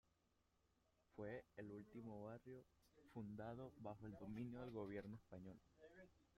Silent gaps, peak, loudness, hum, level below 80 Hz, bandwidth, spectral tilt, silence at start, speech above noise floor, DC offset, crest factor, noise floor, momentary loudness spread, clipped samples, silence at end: none; -40 dBFS; -56 LUFS; none; -78 dBFS; 12.5 kHz; -8.5 dB/octave; 1.15 s; 29 dB; under 0.1%; 18 dB; -84 dBFS; 13 LU; under 0.1%; 0.1 s